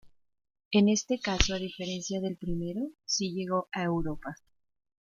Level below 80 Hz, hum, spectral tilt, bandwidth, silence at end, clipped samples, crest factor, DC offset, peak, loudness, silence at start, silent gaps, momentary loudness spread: -44 dBFS; none; -4 dB/octave; 7.4 kHz; 0.7 s; under 0.1%; 28 dB; under 0.1%; -4 dBFS; -30 LUFS; 0.05 s; 0.65-0.71 s; 10 LU